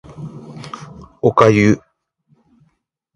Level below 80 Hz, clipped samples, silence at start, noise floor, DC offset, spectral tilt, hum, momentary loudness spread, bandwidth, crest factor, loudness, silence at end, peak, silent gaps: -48 dBFS; under 0.1%; 0.2 s; -65 dBFS; under 0.1%; -7 dB/octave; none; 23 LU; 11 kHz; 18 dB; -14 LUFS; 1.4 s; 0 dBFS; none